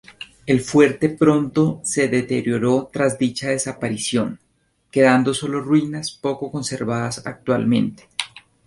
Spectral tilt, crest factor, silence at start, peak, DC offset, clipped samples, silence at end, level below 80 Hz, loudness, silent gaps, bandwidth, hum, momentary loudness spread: -5 dB/octave; 18 dB; 0.1 s; -2 dBFS; under 0.1%; under 0.1%; 0.25 s; -56 dBFS; -20 LUFS; none; 11.5 kHz; none; 11 LU